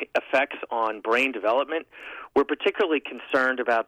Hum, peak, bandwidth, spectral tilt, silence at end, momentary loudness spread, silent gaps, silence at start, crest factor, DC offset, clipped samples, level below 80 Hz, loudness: none; -12 dBFS; 13.5 kHz; -3.5 dB/octave; 0.05 s; 6 LU; none; 0 s; 12 dB; under 0.1%; under 0.1%; -66 dBFS; -25 LUFS